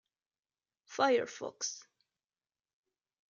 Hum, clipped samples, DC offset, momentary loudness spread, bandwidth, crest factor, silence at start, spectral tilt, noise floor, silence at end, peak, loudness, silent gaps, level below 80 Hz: none; under 0.1%; under 0.1%; 16 LU; 7.6 kHz; 24 dB; 0.9 s; -2 dB/octave; under -90 dBFS; 1.5 s; -16 dBFS; -34 LUFS; none; under -90 dBFS